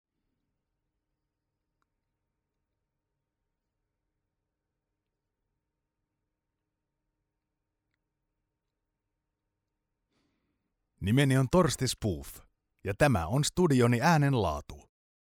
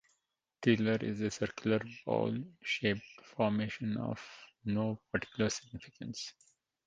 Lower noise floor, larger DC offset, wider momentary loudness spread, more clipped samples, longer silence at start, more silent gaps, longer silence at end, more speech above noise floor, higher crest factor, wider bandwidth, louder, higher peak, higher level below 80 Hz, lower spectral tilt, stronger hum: about the same, -86 dBFS vs -83 dBFS; neither; about the same, 15 LU vs 13 LU; neither; first, 11 s vs 0.6 s; neither; about the same, 0.45 s vs 0.55 s; first, 59 dB vs 48 dB; about the same, 22 dB vs 22 dB; first, 16 kHz vs 9.4 kHz; first, -27 LUFS vs -35 LUFS; first, -10 dBFS vs -14 dBFS; first, -54 dBFS vs -66 dBFS; about the same, -5.5 dB/octave vs -5.5 dB/octave; neither